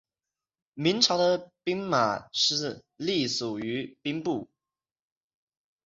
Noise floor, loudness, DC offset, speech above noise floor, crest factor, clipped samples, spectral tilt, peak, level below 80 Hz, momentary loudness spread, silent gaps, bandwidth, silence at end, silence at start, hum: under -90 dBFS; -27 LUFS; under 0.1%; over 62 dB; 24 dB; under 0.1%; -3.5 dB/octave; -6 dBFS; -68 dBFS; 11 LU; none; 8 kHz; 1.4 s; 0.75 s; none